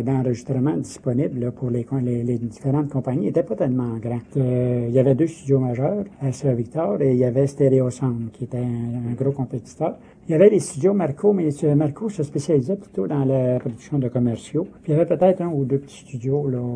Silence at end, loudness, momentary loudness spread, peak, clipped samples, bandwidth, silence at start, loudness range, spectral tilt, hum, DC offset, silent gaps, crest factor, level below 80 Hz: 0 s; -22 LUFS; 8 LU; -2 dBFS; under 0.1%; 10.5 kHz; 0 s; 3 LU; -8.5 dB/octave; none; under 0.1%; none; 18 dB; -54 dBFS